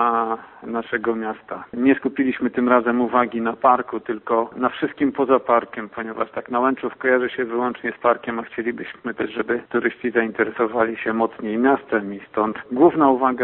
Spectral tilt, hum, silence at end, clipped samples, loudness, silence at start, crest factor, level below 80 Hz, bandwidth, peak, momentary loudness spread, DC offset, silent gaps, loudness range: -10.5 dB/octave; none; 0 s; under 0.1%; -21 LUFS; 0 s; 20 dB; -62 dBFS; 4.1 kHz; 0 dBFS; 10 LU; under 0.1%; none; 3 LU